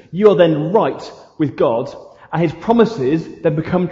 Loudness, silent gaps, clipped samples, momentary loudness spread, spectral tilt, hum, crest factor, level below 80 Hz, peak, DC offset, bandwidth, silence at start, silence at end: -16 LUFS; none; under 0.1%; 11 LU; -8 dB/octave; none; 16 dB; -50 dBFS; 0 dBFS; under 0.1%; 7.6 kHz; 0.1 s; 0 s